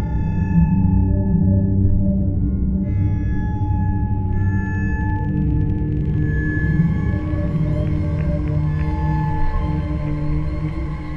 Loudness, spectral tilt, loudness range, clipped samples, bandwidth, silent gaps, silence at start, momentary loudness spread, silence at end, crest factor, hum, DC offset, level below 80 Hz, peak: -20 LUFS; -10.5 dB/octave; 3 LU; under 0.1%; 4.5 kHz; none; 0 s; 6 LU; 0 s; 14 dB; none; under 0.1%; -24 dBFS; -4 dBFS